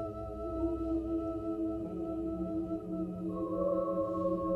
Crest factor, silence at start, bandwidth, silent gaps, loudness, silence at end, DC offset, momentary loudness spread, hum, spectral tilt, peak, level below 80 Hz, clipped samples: 14 dB; 0 s; 4.2 kHz; none; -36 LUFS; 0 s; under 0.1%; 5 LU; none; -10.5 dB/octave; -22 dBFS; -50 dBFS; under 0.1%